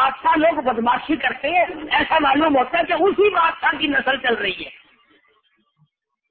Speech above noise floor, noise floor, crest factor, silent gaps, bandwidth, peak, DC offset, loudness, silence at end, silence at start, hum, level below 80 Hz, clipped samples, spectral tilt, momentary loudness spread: 46 dB; -64 dBFS; 14 dB; none; 4.6 kHz; -4 dBFS; under 0.1%; -18 LUFS; 1.6 s; 0 s; none; -52 dBFS; under 0.1%; -8.5 dB/octave; 5 LU